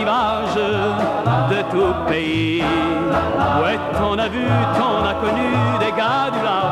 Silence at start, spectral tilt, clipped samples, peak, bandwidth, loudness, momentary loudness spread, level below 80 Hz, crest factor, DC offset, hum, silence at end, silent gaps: 0 s; -6.5 dB/octave; under 0.1%; -6 dBFS; 13.5 kHz; -18 LUFS; 2 LU; -40 dBFS; 12 dB; under 0.1%; none; 0 s; none